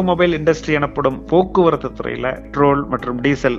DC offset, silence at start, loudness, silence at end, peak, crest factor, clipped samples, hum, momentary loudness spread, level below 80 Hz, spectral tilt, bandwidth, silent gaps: under 0.1%; 0 s; -17 LUFS; 0 s; 0 dBFS; 16 dB; under 0.1%; none; 7 LU; -38 dBFS; -7 dB/octave; 7.6 kHz; none